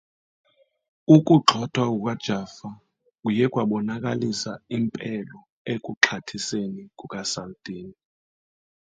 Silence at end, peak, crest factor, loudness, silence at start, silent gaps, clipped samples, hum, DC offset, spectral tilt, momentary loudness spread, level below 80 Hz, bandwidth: 1.05 s; 0 dBFS; 24 dB; -23 LUFS; 1.1 s; 5.52-5.65 s, 5.97-6.01 s; under 0.1%; none; under 0.1%; -5 dB/octave; 20 LU; -64 dBFS; 9.4 kHz